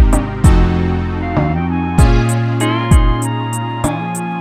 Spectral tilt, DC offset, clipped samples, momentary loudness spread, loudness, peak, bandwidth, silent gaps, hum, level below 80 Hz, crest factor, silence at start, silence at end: -6.5 dB/octave; under 0.1%; under 0.1%; 7 LU; -15 LUFS; 0 dBFS; 15 kHz; none; none; -18 dBFS; 12 dB; 0 s; 0 s